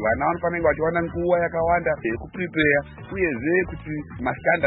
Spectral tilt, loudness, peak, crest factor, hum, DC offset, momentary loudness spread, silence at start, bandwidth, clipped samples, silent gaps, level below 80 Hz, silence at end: -11 dB/octave; -23 LUFS; -6 dBFS; 18 dB; none; under 0.1%; 9 LU; 0 s; 4 kHz; under 0.1%; none; -44 dBFS; 0 s